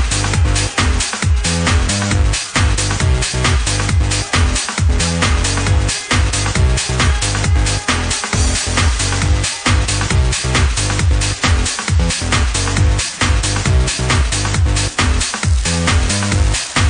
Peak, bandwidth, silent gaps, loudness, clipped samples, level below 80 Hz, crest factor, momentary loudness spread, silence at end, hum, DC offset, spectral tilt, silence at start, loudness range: 0 dBFS; 10.5 kHz; none; -15 LUFS; under 0.1%; -20 dBFS; 14 dB; 1 LU; 0 s; none; under 0.1%; -3.5 dB/octave; 0 s; 0 LU